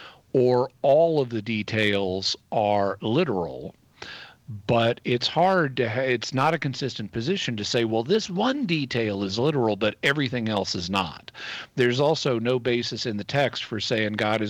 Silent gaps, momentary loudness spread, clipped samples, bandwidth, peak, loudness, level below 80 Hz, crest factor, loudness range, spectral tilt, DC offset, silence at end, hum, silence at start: none; 11 LU; under 0.1%; 14.5 kHz; -10 dBFS; -24 LUFS; -60 dBFS; 14 dB; 2 LU; -5.5 dB/octave; under 0.1%; 0 s; none; 0 s